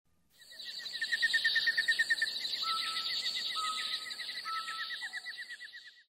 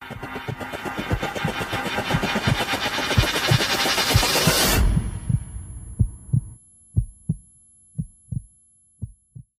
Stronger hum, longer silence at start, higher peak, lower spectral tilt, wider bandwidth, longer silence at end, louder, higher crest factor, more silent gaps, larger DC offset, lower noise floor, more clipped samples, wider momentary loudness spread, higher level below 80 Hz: neither; first, 0.4 s vs 0 s; second, -18 dBFS vs -4 dBFS; second, 2.5 dB/octave vs -4 dB/octave; about the same, 16 kHz vs 15.5 kHz; about the same, 0.1 s vs 0.2 s; second, -32 LUFS vs -22 LUFS; about the same, 18 dB vs 20 dB; neither; neither; about the same, -59 dBFS vs -58 dBFS; neither; about the same, 16 LU vs 17 LU; second, -84 dBFS vs -32 dBFS